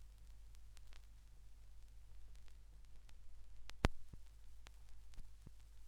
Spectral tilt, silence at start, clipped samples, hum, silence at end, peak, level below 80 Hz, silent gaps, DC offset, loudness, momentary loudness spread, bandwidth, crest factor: -5.5 dB/octave; 0 s; under 0.1%; none; 0 s; -10 dBFS; -54 dBFS; none; under 0.1%; -52 LUFS; 22 LU; 15 kHz; 38 dB